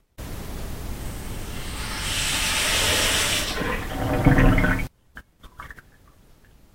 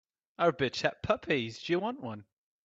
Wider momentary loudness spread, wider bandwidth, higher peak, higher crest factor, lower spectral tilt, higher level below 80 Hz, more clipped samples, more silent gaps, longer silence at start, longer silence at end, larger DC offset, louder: first, 18 LU vs 13 LU; first, 16 kHz vs 7.8 kHz; first, -2 dBFS vs -12 dBFS; about the same, 22 dB vs 22 dB; second, -3.5 dB/octave vs -5.5 dB/octave; first, -30 dBFS vs -64 dBFS; neither; neither; second, 0.2 s vs 0.4 s; first, 0.95 s vs 0.4 s; neither; first, -22 LUFS vs -31 LUFS